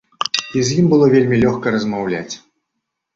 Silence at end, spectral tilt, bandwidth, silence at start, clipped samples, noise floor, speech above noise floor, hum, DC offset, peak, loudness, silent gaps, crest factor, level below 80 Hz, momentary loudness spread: 0.8 s; -5.5 dB/octave; 7.8 kHz; 0.2 s; under 0.1%; -77 dBFS; 62 dB; none; under 0.1%; 0 dBFS; -16 LUFS; none; 16 dB; -50 dBFS; 12 LU